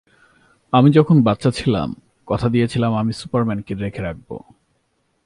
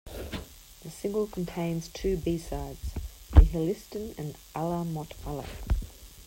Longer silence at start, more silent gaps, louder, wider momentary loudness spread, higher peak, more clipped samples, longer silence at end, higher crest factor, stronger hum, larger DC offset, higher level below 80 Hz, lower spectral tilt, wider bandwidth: first, 0.75 s vs 0.05 s; neither; first, -18 LUFS vs -31 LUFS; about the same, 16 LU vs 17 LU; first, 0 dBFS vs -4 dBFS; neither; first, 0.85 s vs 0.05 s; second, 18 dB vs 26 dB; neither; neither; second, -46 dBFS vs -32 dBFS; about the same, -8 dB/octave vs -7 dB/octave; second, 11.5 kHz vs 16.5 kHz